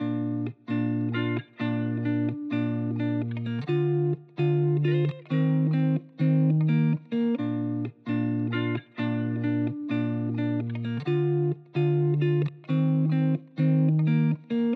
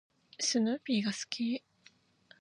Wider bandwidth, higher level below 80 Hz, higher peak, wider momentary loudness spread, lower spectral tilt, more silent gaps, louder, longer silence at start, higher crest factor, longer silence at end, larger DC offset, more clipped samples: second, 4.6 kHz vs 11 kHz; about the same, -84 dBFS vs -84 dBFS; about the same, -14 dBFS vs -16 dBFS; about the same, 7 LU vs 6 LU; first, -10.5 dB/octave vs -3 dB/octave; neither; first, -27 LUFS vs -33 LUFS; second, 0 s vs 0.4 s; second, 12 dB vs 20 dB; second, 0 s vs 0.8 s; neither; neither